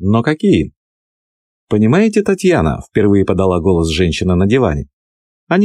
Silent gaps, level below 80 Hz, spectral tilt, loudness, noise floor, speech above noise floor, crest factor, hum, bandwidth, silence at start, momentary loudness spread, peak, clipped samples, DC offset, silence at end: 0.76-1.67 s, 4.93-5.47 s; -32 dBFS; -7 dB/octave; -14 LUFS; under -90 dBFS; over 77 dB; 12 dB; none; 12 kHz; 0 s; 5 LU; -2 dBFS; under 0.1%; 0.4%; 0 s